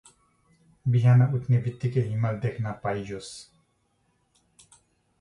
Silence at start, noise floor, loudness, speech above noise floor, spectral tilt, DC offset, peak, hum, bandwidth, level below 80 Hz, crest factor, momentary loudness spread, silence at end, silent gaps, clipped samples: 0.85 s; -70 dBFS; -25 LUFS; 46 dB; -8 dB/octave; under 0.1%; -10 dBFS; none; 10.5 kHz; -60 dBFS; 16 dB; 17 LU; 1.8 s; none; under 0.1%